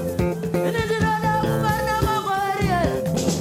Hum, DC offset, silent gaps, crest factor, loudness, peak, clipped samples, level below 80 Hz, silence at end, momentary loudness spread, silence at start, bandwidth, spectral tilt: none; under 0.1%; none; 14 dB; -22 LUFS; -8 dBFS; under 0.1%; -36 dBFS; 0 s; 3 LU; 0 s; 16.5 kHz; -5.5 dB/octave